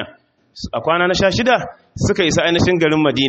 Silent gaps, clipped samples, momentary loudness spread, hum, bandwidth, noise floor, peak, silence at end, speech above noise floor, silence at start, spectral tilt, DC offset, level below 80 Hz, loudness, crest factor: none; under 0.1%; 14 LU; none; 8.2 kHz; -47 dBFS; -2 dBFS; 0 s; 31 dB; 0 s; -4.5 dB/octave; under 0.1%; -40 dBFS; -16 LUFS; 14 dB